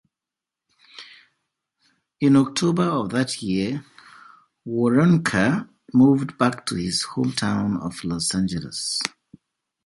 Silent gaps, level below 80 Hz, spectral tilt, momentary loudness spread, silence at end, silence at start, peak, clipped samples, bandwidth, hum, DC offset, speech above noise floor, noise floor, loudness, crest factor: none; -54 dBFS; -5 dB/octave; 11 LU; 0.75 s; 0.95 s; -2 dBFS; under 0.1%; 11.5 kHz; none; under 0.1%; 67 dB; -88 dBFS; -22 LUFS; 20 dB